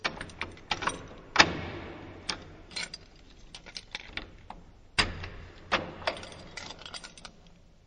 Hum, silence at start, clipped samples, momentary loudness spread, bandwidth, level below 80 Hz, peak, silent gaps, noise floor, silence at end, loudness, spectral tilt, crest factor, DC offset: none; 0 s; under 0.1%; 22 LU; 9.8 kHz; -50 dBFS; -2 dBFS; none; -55 dBFS; 0.1 s; -32 LUFS; -2.5 dB/octave; 32 dB; under 0.1%